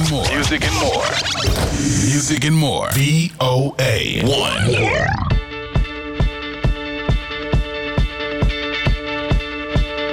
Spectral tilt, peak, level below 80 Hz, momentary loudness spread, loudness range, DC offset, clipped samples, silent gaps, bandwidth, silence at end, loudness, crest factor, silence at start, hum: -4.5 dB/octave; -8 dBFS; -26 dBFS; 6 LU; 5 LU; 0.1%; under 0.1%; none; 18 kHz; 0 s; -18 LUFS; 12 dB; 0 s; none